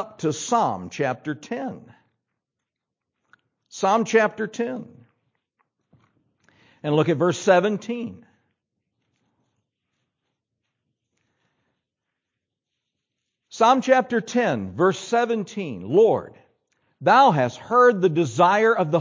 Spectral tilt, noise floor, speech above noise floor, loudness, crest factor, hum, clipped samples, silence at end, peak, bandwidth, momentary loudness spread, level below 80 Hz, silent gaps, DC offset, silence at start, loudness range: -5.5 dB/octave; -85 dBFS; 64 dB; -21 LUFS; 20 dB; none; under 0.1%; 0 s; -4 dBFS; 7.6 kHz; 14 LU; -66 dBFS; none; under 0.1%; 0 s; 9 LU